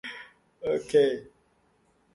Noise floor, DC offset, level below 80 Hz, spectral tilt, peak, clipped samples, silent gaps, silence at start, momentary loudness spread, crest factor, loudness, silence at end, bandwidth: -67 dBFS; under 0.1%; -66 dBFS; -5 dB/octave; -10 dBFS; under 0.1%; none; 0.05 s; 17 LU; 20 dB; -27 LUFS; 0.9 s; 11.5 kHz